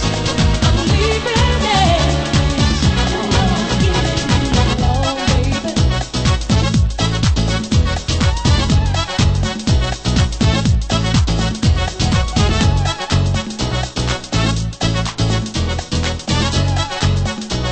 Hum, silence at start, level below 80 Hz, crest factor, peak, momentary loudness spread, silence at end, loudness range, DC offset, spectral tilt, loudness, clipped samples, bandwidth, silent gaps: none; 0 s; -22 dBFS; 14 dB; 0 dBFS; 5 LU; 0 s; 3 LU; under 0.1%; -5 dB/octave; -16 LUFS; under 0.1%; 8.8 kHz; none